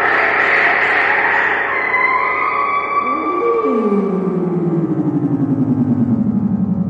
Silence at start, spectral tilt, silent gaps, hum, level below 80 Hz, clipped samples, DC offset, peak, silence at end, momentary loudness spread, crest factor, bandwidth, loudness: 0 s; -8 dB/octave; none; none; -52 dBFS; under 0.1%; under 0.1%; -2 dBFS; 0 s; 5 LU; 14 dB; 8 kHz; -15 LUFS